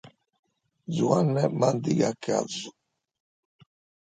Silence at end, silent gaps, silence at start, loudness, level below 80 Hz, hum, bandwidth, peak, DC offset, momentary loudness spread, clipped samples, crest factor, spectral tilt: 1.45 s; 0.39-0.43 s; 0.05 s; -26 LUFS; -70 dBFS; none; 9.4 kHz; -8 dBFS; under 0.1%; 13 LU; under 0.1%; 20 dB; -6 dB/octave